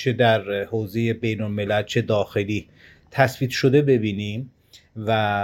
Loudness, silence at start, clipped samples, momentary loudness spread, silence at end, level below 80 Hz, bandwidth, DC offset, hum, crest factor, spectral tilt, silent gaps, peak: -22 LUFS; 0 s; under 0.1%; 12 LU; 0 s; -56 dBFS; 16.5 kHz; under 0.1%; none; 20 dB; -6.5 dB/octave; none; -2 dBFS